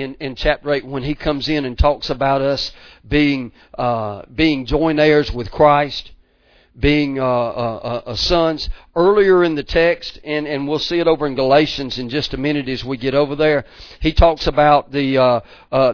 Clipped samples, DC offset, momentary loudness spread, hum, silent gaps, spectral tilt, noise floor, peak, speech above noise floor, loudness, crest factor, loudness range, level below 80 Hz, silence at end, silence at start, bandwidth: under 0.1%; under 0.1%; 10 LU; none; none; -6.5 dB/octave; -54 dBFS; 0 dBFS; 37 dB; -17 LUFS; 18 dB; 3 LU; -30 dBFS; 0 s; 0 s; 5.4 kHz